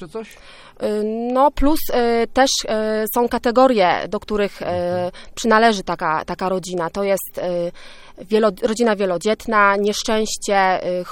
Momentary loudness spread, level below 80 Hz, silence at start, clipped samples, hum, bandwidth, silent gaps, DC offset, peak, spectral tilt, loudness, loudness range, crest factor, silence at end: 9 LU; -38 dBFS; 0 s; under 0.1%; none; 17 kHz; none; under 0.1%; 0 dBFS; -4 dB/octave; -19 LUFS; 3 LU; 18 dB; 0 s